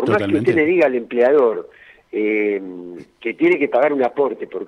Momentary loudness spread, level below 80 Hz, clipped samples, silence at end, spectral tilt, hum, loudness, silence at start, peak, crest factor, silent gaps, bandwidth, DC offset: 14 LU; -62 dBFS; under 0.1%; 0 s; -7.5 dB/octave; none; -17 LUFS; 0 s; -4 dBFS; 12 dB; none; 10 kHz; under 0.1%